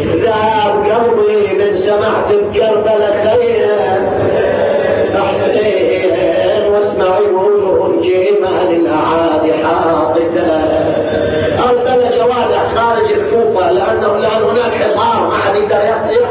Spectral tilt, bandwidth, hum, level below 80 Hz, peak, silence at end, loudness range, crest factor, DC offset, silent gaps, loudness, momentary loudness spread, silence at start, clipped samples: -10 dB/octave; 4 kHz; none; -40 dBFS; -2 dBFS; 0 s; 1 LU; 10 dB; under 0.1%; none; -12 LUFS; 2 LU; 0 s; under 0.1%